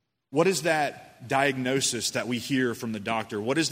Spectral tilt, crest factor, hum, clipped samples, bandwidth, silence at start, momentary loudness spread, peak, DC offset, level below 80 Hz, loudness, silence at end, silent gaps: -3.5 dB/octave; 20 dB; none; under 0.1%; 16 kHz; 0.3 s; 7 LU; -8 dBFS; under 0.1%; -68 dBFS; -27 LUFS; 0 s; none